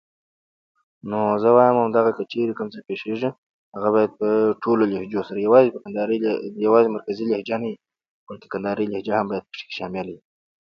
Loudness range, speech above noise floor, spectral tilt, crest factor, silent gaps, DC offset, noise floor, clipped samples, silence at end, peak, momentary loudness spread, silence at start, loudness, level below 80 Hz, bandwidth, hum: 6 LU; over 69 dB; -8.5 dB/octave; 20 dB; 3.38-3.72 s, 8.09-8.27 s; under 0.1%; under -90 dBFS; under 0.1%; 0.5 s; -2 dBFS; 15 LU; 1.05 s; -21 LUFS; -66 dBFS; 6.2 kHz; none